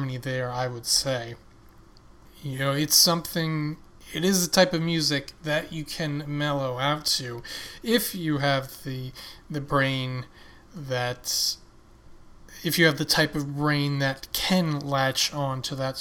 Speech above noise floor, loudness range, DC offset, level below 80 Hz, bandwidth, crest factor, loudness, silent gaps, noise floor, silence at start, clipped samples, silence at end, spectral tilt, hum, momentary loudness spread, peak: 25 dB; 6 LU; under 0.1%; -52 dBFS; 18 kHz; 22 dB; -25 LUFS; none; -51 dBFS; 0 s; under 0.1%; 0 s; -3.5 dB/octave; none; 15 LU; -6 dBFS